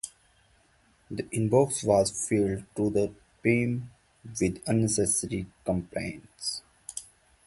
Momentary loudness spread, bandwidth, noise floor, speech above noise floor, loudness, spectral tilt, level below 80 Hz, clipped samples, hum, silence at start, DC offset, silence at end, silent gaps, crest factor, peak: 16 LU; 12 kHz; -64 dBFS; 37 dB; -28 LUFS; -5 dB/octave; -54 dBFS; under 0.1%; none; 0.05 s; under 0.1%; 0.45 s; none; 20 dB; -8 dBFS